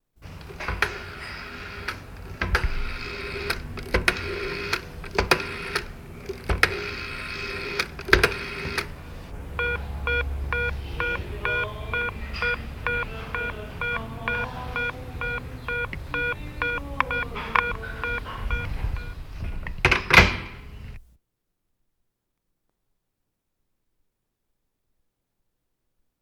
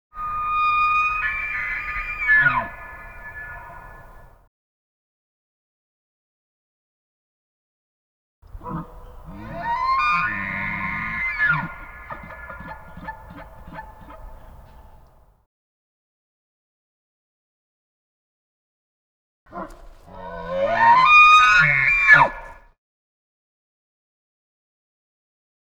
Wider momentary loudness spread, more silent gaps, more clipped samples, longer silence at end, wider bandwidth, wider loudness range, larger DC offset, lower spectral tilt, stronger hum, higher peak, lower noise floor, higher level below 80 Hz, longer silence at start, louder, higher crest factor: second, 13 LU vs 26 LU; second, none vs 4.47-8.42 s, 15.46-19.46 s; neither; first, 5.2 s vs 3.25 s; about the same, 19.5 kHz vs over 20 kHz; second, 6 LU vs 25 LU; neither; about the same, -4 dB/octave vs -3.5 dB/octave; neither; about the same, 0 dBFS vs 0 dBFS; first, -78 dBFS vs -52 dBFS; first, -36 dBFS vs -46 dBFS; about the same, 0.2 s vs 0.15 s; second, -26 LUFS vs -17 LUFS; first, 28 dB vs 22 dB